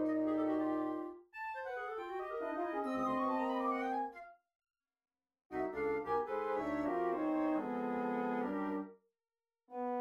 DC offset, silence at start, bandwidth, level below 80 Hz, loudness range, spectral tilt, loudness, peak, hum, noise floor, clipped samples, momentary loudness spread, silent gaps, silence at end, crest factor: under 0.1%; 0 s; 7.4 kHz; -70 dBFS; 3 LU; -7 dB/octave; -38 LUFS; -24 dBFS; none; under -90 dBFS; under 0.1%; 9 LU; 4.55-4.60 s, 5.45-5.50 s; 0 s; 14 dB